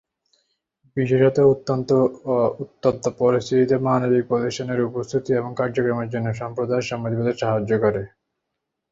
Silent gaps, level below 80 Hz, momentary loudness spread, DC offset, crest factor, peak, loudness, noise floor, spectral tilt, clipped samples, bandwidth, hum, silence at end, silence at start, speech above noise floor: none; -56 dBFS; 8 LU; under 0.1%; 18 dB; -4 dBFS; -21 LUFS; -80 dBFS; -7 dB/octave; under 0.1%; 7.8 kHz; none; 0.85 s; 0.95 s; 60 dB